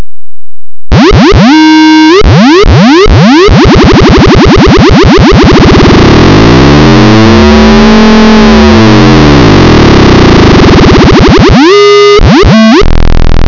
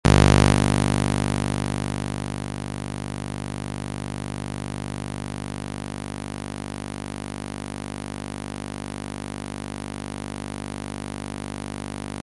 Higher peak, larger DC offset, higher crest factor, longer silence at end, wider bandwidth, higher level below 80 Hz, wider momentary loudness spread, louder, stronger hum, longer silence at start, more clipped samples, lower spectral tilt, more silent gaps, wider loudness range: about the same, 0 dBFS vs 0 dBFS; neither; second, 0 dB vs 26 dB; about the same, 0 s vs 0 s; second, 6 kHz vs 11.5 kHz; first, -10 dBFS vs -34 dBFS; second, 1 LU vs 12 LU; first, -1 LUFS vs -27 LUFS; neither; about the same, 0 s vs 0.05 s; first, 100% vs under 0.1%; about the same, -6.5 dB/octave vs -5.5 dB/octave; neither; second, 0 LU vs 8 LU